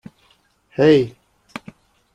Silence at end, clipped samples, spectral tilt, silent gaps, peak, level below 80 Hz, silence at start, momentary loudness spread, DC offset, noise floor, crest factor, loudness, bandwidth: 1.05 s; under 0.1%; -7.5 dB/octave; none; -2 dBFS; -58 dBFS; 0.8 s; 22 LU; under 0.1%; -59 dBFS; 18 dB; -16 LUFS; 9.6 kHz